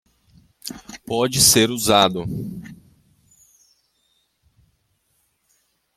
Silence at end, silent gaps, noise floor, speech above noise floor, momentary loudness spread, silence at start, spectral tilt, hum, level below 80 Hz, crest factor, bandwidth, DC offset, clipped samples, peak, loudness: 3.25 s; none; -68 dBFS; 50 dB; 23 LU; 0.65 s; -2.5 dB/octave; none; -52 dBFS; 24 dB; 16.5 kHz; under 0.1%; under 0.1%; 0 dBFS; -17 LUFS